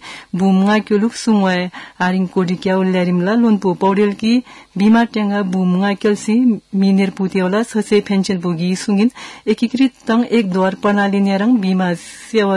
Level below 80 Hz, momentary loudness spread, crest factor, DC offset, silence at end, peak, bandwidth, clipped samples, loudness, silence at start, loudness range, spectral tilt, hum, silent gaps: -58 dBFS; 5 LU; 12 dB; under 0.1%; 0 s; -4 dBFS; 11.5 kHz; under 0.1%; -16 LUFS; 0.05 s; 1 LU; -6.5 dB/octave; none; none